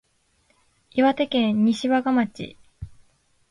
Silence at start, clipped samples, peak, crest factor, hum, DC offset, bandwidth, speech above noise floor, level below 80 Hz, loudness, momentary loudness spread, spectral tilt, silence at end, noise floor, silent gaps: 0.95 s; under 0.1%; -8 dBFS; 16 dB; none; under 0.1%; 11.5 kHz; 44 dB; -54 dBFS; -22 LUFS; 23 LU; -6 dB/octave; 0.65 s; -65 dBFS; none